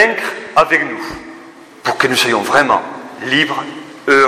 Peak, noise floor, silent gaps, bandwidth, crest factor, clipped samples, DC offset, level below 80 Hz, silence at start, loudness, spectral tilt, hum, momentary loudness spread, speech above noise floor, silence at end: 0 dBFS; -37 dBFS; none; 15.5 kHz; 16 dB; under 0.1%; under 0.1%; -52 dBFS; 0 s; -14 LUFS; -3 dB/octave; none; 16 LU; 22 dB; 0 s